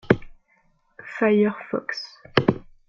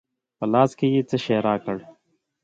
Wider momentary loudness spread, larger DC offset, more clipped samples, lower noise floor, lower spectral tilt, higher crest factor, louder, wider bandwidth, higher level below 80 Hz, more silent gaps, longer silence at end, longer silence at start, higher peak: first, 14 LU vs 11 LU; neither; neither; about the same, -64 dBFS vs -67 dBFS; about the same, -7.5 dB/octave vs -7.5 dB/octave; about the same, 22 dB vs 20 dB; about the same, -23 LUFS vs -22 LUFS; about the same, 7.2 kHz vs 7.8 kHz; first, -52 dBFS vs -62 dBFS; neither; second, 0.3 s vs 0.6 s; second, 0.1 s vs 0.4 s; about the same, -2 dBFS vs -4 dBFS